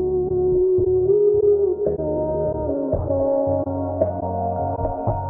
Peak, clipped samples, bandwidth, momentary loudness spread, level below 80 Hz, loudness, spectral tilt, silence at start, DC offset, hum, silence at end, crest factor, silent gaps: -4 dBFS; under 0.1%; 1.9 kHz; 7 LU; -38 dBFS; -21 LUFS; -14.5 dB/octave; 0 s; under 0.1%; none; 0 s; 16 dB; none